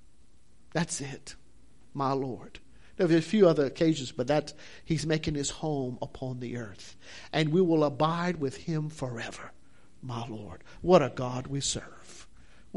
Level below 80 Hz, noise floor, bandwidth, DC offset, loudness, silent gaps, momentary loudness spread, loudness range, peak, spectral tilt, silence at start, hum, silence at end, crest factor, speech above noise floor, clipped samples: -56 dBFS; -62 dBFS; 11.5 kHz; 0.3%; -29 LUFS; none; 23 LU; 5 LU; -8 dBFS; -5.5 dB/octave; 0.75 s; none; 0.55 s; 22 dB; 33 dB; under 0.1%